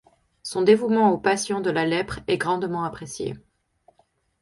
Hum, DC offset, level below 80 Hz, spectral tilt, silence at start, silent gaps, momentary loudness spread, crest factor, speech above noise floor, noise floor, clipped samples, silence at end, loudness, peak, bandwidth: none; under 0.1%; -54 dBFS; -5 dB/octave; 0.45 s; none; 13 LU; 20 dB; 43 dB; -65 dBFS; under 0.1%; 1.05 s; -23 LUFS; -4 dBFS; 11.5 kHz